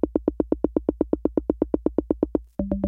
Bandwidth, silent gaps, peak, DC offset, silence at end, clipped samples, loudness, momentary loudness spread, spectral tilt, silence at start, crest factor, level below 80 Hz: 3.1 kHz; none; -6 dBFS; under 0.1%; 0 s; under 0.1%; -26 LUFS; 2 LU; -12 dB/octave; 0.05 s; 18 dB; -40 dBFS